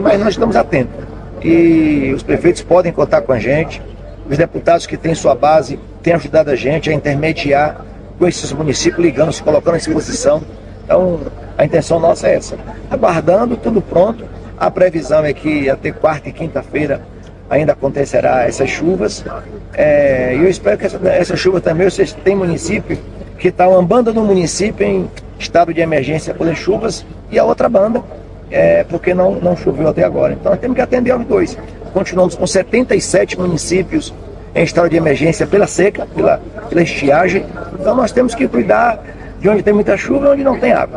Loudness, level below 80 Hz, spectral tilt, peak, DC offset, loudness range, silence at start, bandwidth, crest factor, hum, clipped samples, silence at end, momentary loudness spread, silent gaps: -14 LUFS; -34 dBFS; -6 dB/octave; 0 dBFS; under 0.1%; 2 LU; 0 s; 11 kHz; 14 dB; none; under 0.1%; 0 s; 10 LU; none